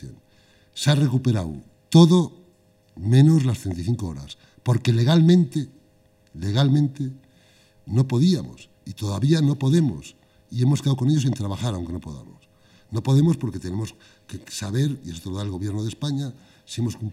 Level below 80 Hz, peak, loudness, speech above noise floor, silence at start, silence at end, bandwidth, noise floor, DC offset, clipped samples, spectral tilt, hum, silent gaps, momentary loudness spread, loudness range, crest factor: -54 dBFS; -2 dBFS; -22 LUFS; 37 dB; 0 s; 0 s; 14 kHz; -58 dBFS; under 0.1%; under 0.1%; -7 dB/octave; none; none; 18 LU; 6 LU; 20 dB